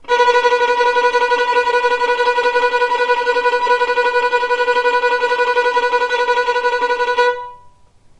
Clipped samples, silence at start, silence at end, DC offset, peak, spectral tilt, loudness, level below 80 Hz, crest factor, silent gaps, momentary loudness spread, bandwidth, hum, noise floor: under 0.1%; 0.05 s; 0.5 s; under 0.1%; -2 dBFS; -0.5 dB/octave; -15 LUFS; -54 dBFS; 12 dB; none; 3 LU; 10.5 kHz; none; -48 dBFS